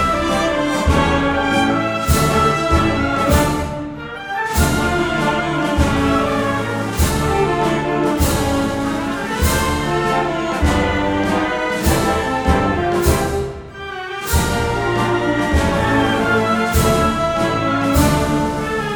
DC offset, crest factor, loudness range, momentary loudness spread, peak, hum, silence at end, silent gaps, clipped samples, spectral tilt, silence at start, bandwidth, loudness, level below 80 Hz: under 0.1%; 16 dB; 2 LU; 5 LU; -2 dBFS; none; 0 s; none; under 0.1%; -5 dB/octave; 0 s; over 20 kHz; -17 LUFS; -26 dBFS